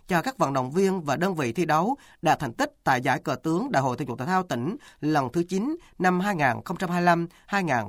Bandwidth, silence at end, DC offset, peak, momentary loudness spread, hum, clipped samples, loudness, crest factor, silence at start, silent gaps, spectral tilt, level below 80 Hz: 16.5 kHz; 0 s; under 0.1%; -8 dBFS; 6 LU; none; under 0.1%; -26 LUFS; 18 dB; 0.1 s; none; -6 dB/octave; -58 dBFS